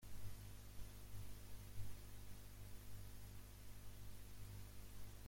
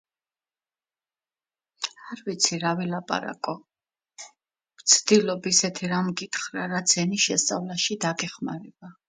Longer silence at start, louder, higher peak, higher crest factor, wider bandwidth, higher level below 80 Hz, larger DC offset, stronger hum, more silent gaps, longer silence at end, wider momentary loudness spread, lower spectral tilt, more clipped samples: second, 0 s vs 1.8 s; second, -59 LUFS vs -24 LUFS; second, -34 dBFS vs -2 dBFS; second, 16 dB vs 26 dB; first, 16.5 kHz vs 11 kHz; first, -60 dBFS vs -72 dBFS; neither; first, 50 Hz at -60 dBFS vs none; neither; second, 0 s vs 0.15 s; second, 3 LU vs 15 LU; first, -4.5 dB/octave vs -2.5 dB/octave; neither